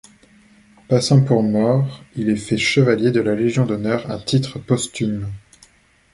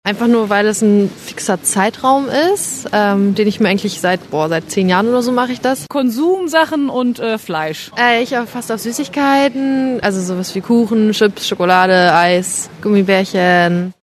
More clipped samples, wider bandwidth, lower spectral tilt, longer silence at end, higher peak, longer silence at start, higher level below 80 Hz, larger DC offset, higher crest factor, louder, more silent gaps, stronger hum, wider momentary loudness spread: neither; second, 11.5 kHz vs 13.5 kHz; first, -6 dB/octave vs -4.5 dB/octave; first, 0.75 s vs 0.1 s; about the same, -2 dBFS vs 0 dBFS; first, 0.9 s vs 0.05 s; first, -50 dBFS vs -56 dBFS; neither; about the same, 16 dB vs 14 dB; second, -19 LUFS vs -14 LUFS; neither; neither; about the same, 9 LU vs 8 LU